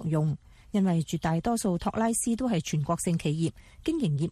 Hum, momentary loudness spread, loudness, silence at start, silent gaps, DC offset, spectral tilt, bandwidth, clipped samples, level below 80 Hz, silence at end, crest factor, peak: none; 6 LU; -28 LUFS; 0 s; none; under 0.1%; -6 dB/octave; 14 kHz; under 0.1%; -52 dBFS; 0 s; 14 dB; -14 dBFS